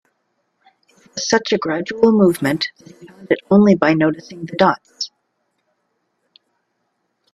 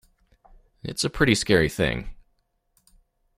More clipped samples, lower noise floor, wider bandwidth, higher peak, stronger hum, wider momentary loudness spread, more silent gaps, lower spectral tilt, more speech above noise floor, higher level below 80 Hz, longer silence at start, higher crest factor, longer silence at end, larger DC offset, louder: neither; about the same, -70 dBFS vs -69 dBFS; second, 13.5 kHz vs 16 kHz; about the same, 0 dBFS vs -2 dBFS; neither; about the same, 15 LU vs 17 LU; neither; about the same, -5.5 dB/octave vs -4.5 dB/octave; first, 54 dB vs 47 dB; second, -60 dBFS vs -42 dBFS; first, 1.15 s vs 0.85 s; second, 18 dB vs 24 dB; first, 2.25 s vs 1.25 s; neither; first, -17 LUFS vs -23 LUFS